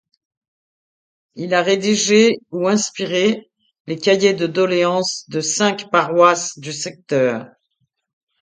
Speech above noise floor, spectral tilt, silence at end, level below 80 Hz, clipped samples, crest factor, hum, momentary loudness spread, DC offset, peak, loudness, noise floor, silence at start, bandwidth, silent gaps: 53 dB; -3.5 dB/octave; 0.95 s; -66 dBFS; under 0.1%; 18 dB; none; 12 LU; under 0.1%; 0 dBFS; -17 LUFS; -70 dBFS; 1.35 s; 9.6 kHz; 3.80-3.85 s